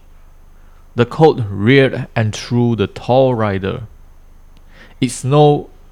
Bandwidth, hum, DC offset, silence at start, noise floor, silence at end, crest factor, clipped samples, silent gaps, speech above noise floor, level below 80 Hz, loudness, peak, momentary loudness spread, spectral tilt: 12.5 kHz; none; under 0.1%; 0.95 s; -41 dBFS; 0.25 s; 16 dB; under 0.1%; none; 27 dB; -40 dBFS; -15 LUFS; 0 dBFS; 10 LU; -6.5 dB/octave